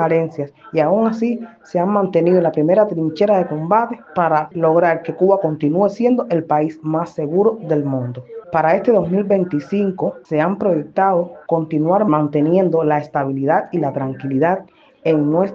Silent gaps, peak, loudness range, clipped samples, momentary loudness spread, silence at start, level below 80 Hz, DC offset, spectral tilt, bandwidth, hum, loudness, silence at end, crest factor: none; -2 dBFS; 2 LU; under 0.1%; 7 LU; 0 s; -62 dBFS; under 0.1%; -9.5 dB/octave; 7.2 kHz; none; -17 LUFS; 0 s; 14 dB